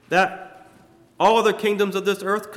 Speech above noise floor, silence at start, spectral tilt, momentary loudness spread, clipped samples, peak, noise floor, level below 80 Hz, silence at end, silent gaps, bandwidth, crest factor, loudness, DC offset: 32 dB; 0.1 s; -4.5 dB/octave; 7 LU; under 0.1%; -6 dBFS; -52 dBFS; -64 dBFS; 0 s; none; 15.5 kHz; 16 dB; -20 LUFS; under 0.1%